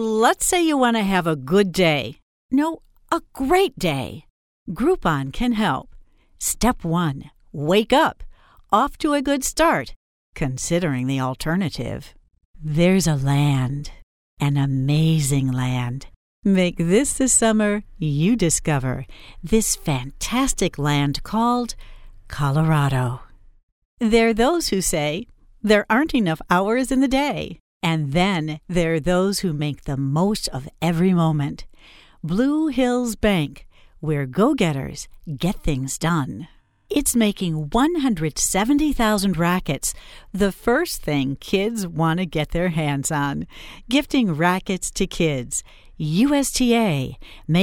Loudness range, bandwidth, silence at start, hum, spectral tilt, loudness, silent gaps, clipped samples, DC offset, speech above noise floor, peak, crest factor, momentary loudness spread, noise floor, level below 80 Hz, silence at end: 3 LU; 17.5 kHz; 0 s; none; -5 dB/octave; -21 LUFS; 2.22-2.49 s, 4.30-4.66 s, 9.96-10.33 s, 12.45-12.54 s, 14.03-14.37 s, 16.16-16.43 s, 23.63-23.97 s, 27.60-27.80 s; under 0.1%; under 0.1%; 27 dB; -2 dBFS; 18 dB; 11 LU; -48 dBFS; -38 dBFS; 0 s